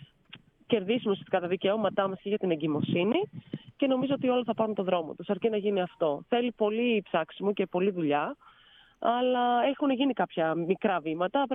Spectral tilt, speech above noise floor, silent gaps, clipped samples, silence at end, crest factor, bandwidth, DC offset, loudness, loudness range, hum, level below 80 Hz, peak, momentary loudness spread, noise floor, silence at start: -9.5 dB/octave; 31 dB; none; under 0.1%; 0 s; 18 dB; 3.9 kHz; under 0.1%; -29 LUFS; 1 LU; none; -72 dBFS; -12 dBFS; 5 LU; -59 dBFS; 0 s